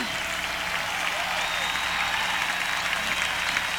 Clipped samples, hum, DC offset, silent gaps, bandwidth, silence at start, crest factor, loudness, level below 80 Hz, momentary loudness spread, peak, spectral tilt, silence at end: under 0.1%; none; under 0.1%; none; over 20 kHz; 0 s; 20 dB; -25 LUFS; -50 dBFS; 3 LU; -8 dBFS; -0.5 dB/octave; 0 s